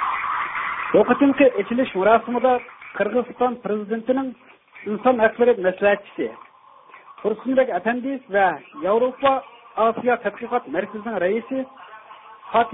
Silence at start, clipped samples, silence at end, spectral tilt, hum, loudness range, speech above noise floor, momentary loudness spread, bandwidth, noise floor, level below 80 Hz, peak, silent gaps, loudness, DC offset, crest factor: 0 s; under 0.1%; 0 s; -10.5 dB/octave; none; 4 LU; 28 dB; 12 LU; 3.9 kHz; -48 dBFS; -60 dBFS; -2 dBFS; none; -21 LUFS; under 0.1%; 20 dB